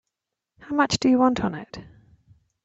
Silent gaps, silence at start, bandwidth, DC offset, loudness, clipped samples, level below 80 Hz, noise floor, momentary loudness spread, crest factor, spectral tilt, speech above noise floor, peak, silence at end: none; 0.6 s; 8 kHz; under 0.1%; -22 LUFS; under 0.1%; -54 dBFS; -84 dBFS; 21 LU; 18 dB; -4.5 dB/octave; 62 dB; -6 dBFS; 0.75 s